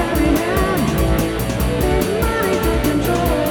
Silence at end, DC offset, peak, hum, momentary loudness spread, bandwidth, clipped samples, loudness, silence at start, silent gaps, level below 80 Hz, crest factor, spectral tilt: 0 s; under 0.1%; -2 dBFS; none; 2 LU; 19.5 kHz; under 0.1%; -18 LUFS; 0 s; none; -24 dBFS; 16 dB; -5.5 dB/octave